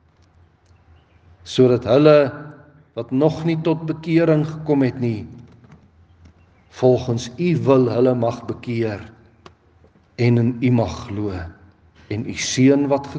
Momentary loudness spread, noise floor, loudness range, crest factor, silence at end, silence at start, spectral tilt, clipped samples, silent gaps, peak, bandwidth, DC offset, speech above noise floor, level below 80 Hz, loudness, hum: 15 LU; -54 dBFS; 5 LU; 20 dB; 0 s; 1.45 s; -6.5 dB/octave; under 0.1%; none; 0 dBFS; 9.4 kHz; under 0.1%; 36 dB; -56 dBFS; -19 LUFS; none